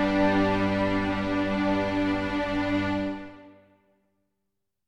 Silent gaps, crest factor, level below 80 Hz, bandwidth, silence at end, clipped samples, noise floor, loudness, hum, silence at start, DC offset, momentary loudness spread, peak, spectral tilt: none; 16 dB; -46 dBFS; 8.8 kHz; 1.35 s; under 0.1%; -83 dBFS; -26 LUFS; none; 0 s; under 0.1%; 7 LU; -12 dBFS; -7 dB/octave